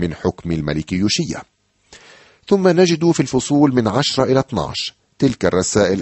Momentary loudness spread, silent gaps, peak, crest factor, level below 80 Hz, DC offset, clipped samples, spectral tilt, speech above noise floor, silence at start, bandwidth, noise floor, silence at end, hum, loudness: 9 LU; none; -2 dBFS; 16 dB; -44 dBFS; under 0.1%; under 0.1%; -5 dB/octave; 32 dB; 0 s; 8.6 kHz; -48 dBFS; 0 s; none; -17 LUFS